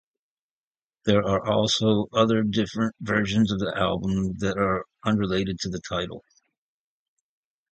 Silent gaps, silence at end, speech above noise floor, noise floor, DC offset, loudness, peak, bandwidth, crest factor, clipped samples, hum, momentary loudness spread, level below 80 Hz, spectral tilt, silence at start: none; 1.55 s; over 66 dB; under -90 dBFS; under 0.1%; -24 LUFS; -6 dBFS; 8.8 kHz; 20 dB; under 0.1%; none; 8 LU; -50 dBFS; -5.5 dB/octave; 1.05 s